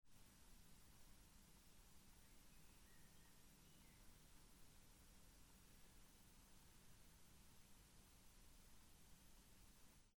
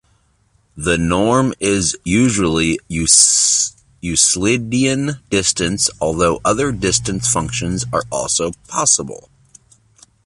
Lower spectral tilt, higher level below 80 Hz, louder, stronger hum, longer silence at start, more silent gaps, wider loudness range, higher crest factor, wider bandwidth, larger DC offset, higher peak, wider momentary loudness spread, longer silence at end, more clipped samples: about the same, -3 dB/octave vs -3 dB/octave; second, -72 dBFS vs -38 dBFS; second, -70 LUFS vs -15 LUFS; neither; second, 0 s vs 0.75 s; neither; second, 0 LU vs 4 LU; about the same, 14 dB vs 18 dB; first, 19.5 kHz vs 11.5 kHz; neither; second, -54 dBFS vs 0 dBFS; second, 1 LU vs 9 LU; second, 0 s vs 1.1 s; neither